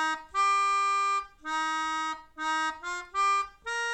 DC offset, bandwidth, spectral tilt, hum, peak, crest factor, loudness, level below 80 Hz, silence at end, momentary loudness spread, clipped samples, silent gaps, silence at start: under 0.1%; 12.5 kHz; 0 dB/octave; none; -18 dBFS; 12 dB; -28 LUFS; -64 dBFS; 0 s; 9 LU; under 0.1%; none; 0 s